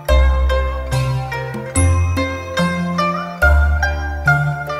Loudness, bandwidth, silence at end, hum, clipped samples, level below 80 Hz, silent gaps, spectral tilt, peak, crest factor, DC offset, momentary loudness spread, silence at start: -17 LUFS; 15 kHz; 0 s; none; under 0.1%; -20 dBFS; none; -5.5 dB/octave; 0 dBFS; 16 dB; under 0.1%; 6 LU; 0 s